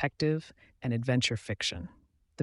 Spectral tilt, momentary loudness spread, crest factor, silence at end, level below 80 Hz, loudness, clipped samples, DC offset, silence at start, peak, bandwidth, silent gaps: -5 dB/octave; 12 LU; 18 dB; 0 s; -58 dBFS; -31 LUFS; under 0.1%; under 0.1%; 0 s; -14 dBFS; 11.5 kHz; none